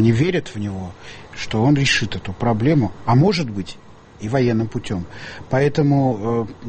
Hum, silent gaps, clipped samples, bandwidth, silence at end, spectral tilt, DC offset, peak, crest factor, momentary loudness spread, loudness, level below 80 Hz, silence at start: none; none; under 0.1%; 8.8 kHz; 0 s; -6.5 dB/octave; under 0.1%; -4 dBFS; 14 dB; 16 LU; -19 LUFS; -42 dBFS; 0 s